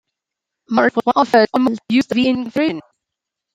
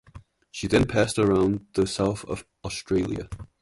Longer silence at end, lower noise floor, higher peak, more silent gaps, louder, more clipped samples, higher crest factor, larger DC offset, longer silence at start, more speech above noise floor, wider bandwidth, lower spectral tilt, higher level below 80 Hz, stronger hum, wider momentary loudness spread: first, 0.75 s vs 0.15 s; first, -83 dBFS vs -49 dBFS; first, -2 dBFS vs -6 dBFS; neither; first, -16 LUFS vs -25 LUFS; neither; about the same, 16 dB vs 18 dB; neither; first, 0.7 s vs 0.15 s; first, 67 dB vs 25 dB; second, 9 kHz vs 11.5 kHz; about the same, -5.5 dB/octave vs -5.5 dB/octave; second, -60 dBFS vs -44 dBFS; neither; second, 7 LU vs 13 LU